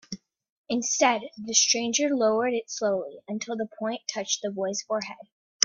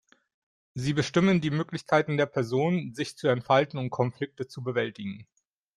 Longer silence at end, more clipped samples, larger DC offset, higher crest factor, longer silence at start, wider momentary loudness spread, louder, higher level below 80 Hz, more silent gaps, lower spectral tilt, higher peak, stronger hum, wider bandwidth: second, 0 s vs 0.55 s; neither; neither; first, 28 dB vs 18 dB; second, 0.1 s vs 0.75 s; about the same, 13 LU vs 12 LU; about the same, -26 LUFS vs -27 LUFS; second, -74 dBFS vs -64 dBFS; first, 0.52-0.64 s, 5.32-5.60 s vs none; second, -1.5 dB/octave vs -6.5 dB/octave; first, 0 dBFS vs -10 dBFS; neither; second, 7.6 kHz vs 12 kHz